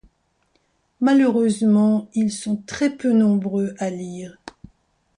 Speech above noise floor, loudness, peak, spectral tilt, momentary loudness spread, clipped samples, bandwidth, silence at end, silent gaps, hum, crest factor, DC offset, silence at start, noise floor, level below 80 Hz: 47 dB; -20 LUFS; -8 dBFS; -6.5 dB/octave; 13 LU; under 0.1%; 11 kHz; 0.85 s; none; none; 14 dB; under 0.1%; 1 s; -66 dBFS; -60 dBFS